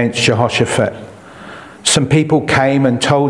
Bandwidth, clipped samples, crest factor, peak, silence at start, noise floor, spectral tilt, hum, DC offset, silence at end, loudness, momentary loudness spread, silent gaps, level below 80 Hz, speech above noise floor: 12 kHz; under 0.1%; 14 dB; 0 dBFS; 0 s; -34 dBFS; -4.5 dB/octave; none; under 0.1%; 0 s; -13 LUFS; 21 LU; none; -46 dBFS; 21 dB